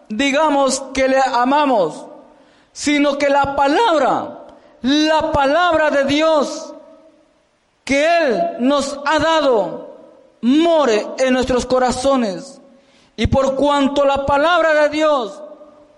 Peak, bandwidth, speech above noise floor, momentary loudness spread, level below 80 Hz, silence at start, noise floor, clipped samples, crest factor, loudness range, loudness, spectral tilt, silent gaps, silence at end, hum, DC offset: -6 dBFS; 11.5 kHz; 44 dB; 9 LU; -42 dBFS; 0.1 s; -60 dBFS; under 0.1%; 10 dB; 2 LU; -16 LUFS; -4 dB/octave; none; 0.35 s; none; under 0.1%